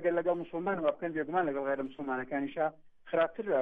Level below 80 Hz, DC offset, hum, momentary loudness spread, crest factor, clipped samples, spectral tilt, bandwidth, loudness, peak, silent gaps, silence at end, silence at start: -70 dBFS; under 0.1%; none; 5 LU; 16 dB; under 0.1%; -9 dB/octave; 3.9 kHz; -33 LUFS; -18 dBFS; none; 0 s; 0 s